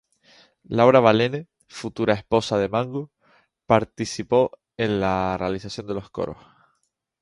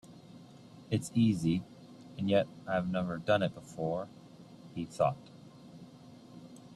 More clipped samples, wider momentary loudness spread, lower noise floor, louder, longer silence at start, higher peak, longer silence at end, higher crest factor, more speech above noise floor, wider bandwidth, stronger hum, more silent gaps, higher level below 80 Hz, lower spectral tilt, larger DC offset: neither; second, 16 LU vs 24 LU; first, -74 dBFS vs -54 dBFS; first, -22 LUFS vs -33 LUFS; first, 0.7 s vs 0.05 s; first, -2 dBFS vs -16 dBFS; first, 0.9 s vs 0 s; about the same, 22 dB vs 20 dB; first, 52 dB vs 22 dB; second, 11.5 kHz vs 13.5 kHz; neither; neither; first, -52 dBFS vs -66 dBFS; about the same, -6 dB/octave vs -6.5 dB/octave; neither